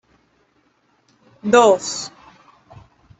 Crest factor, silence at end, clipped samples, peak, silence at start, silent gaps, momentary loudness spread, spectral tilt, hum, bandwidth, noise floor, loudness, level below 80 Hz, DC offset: 20 dB; 1.1 s; under 0.1%; -2 dBFS; 1.45 s; none; 17 LU; -3.5 dB/octave; none; 8.4 kHz; -62 dBFS; -16 LUFS; -60 dBFS; under 0.1%